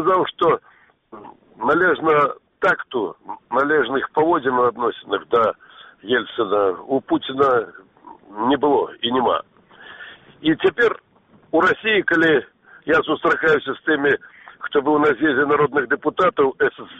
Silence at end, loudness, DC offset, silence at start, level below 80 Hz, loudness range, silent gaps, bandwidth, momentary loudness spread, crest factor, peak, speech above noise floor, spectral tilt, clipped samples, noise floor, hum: 0 s; -19 LUFS; under 0.1%; 0 s; -58 dBFS; 3 LU; none; 7.8 kHz; 9 LU; 16 dB; -4 dBFS; 24 dB; -6.5 dB/octave; under 0.1%; -43 dBFS; none